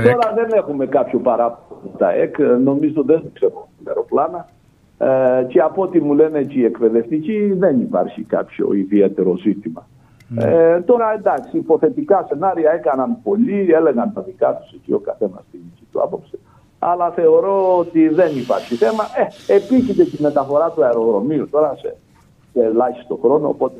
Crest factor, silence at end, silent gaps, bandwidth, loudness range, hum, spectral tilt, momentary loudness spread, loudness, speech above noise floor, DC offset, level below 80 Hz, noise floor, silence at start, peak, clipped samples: 16 dB; 0 s; none; 8 kHz; 3 LU; none; -8.5 dB/octave; 9 LU; -17 LUFS; 34 dB; under 0.1%; -58 dBFS; -50 dBFS; 0 s; 0 dBFS; under 0.1%